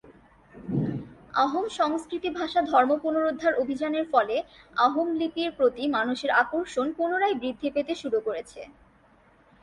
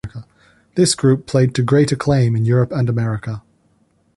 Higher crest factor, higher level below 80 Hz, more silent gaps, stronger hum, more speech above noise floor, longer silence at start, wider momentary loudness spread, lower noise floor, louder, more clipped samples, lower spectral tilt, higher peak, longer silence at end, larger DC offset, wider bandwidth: about the same, 20 dB vs 16 dB; second, -62 dBFS vs -46 dBFS; neither; neither; second, 33 dB vs 44 dB; about the same, 0.05 s vs 0.05 s; second, 9 LU vs 14 LU; about the same, -59 dBFS vs -59 dBFS; second, -26 LUFS vs -17 LUFS; neither; about the same, -5.5 dB/octave vs -6 dB/octave; second, -8 dBFS vs -2 dBFS; first, 0.95 s vs 0.8 s; neither; about the same, 11.5 kHz vs 11.5 kHz